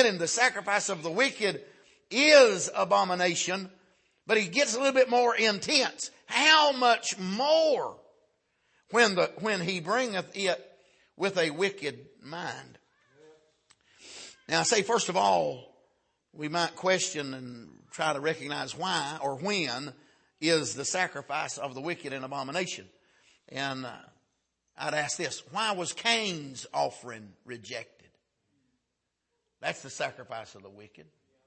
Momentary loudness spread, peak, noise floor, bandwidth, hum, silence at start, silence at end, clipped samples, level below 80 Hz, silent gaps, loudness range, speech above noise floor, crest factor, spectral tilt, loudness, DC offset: 18 LU; -6 dBFS; -82 dBFS; 8.8 kHz; none; 0 s; 0.45 s; under 0.1%; -78 dBFS; none; 12 LU; 54 dB; 24 dB; -2.5 dB/octave; -27 LUFS; under 0.1%